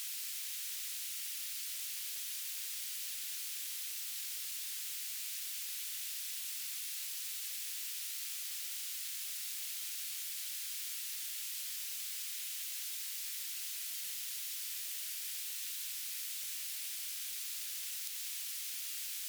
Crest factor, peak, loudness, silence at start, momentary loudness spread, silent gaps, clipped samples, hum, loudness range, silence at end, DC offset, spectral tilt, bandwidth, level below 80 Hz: 22 dB; -18 dBFS; -38 LUFS; 0 s; 0 LU; none; under 0.1%; none; 0 LU; 0 s; under 0.1%; 10 dB/octave; over 20 kHz; under -90 dBFS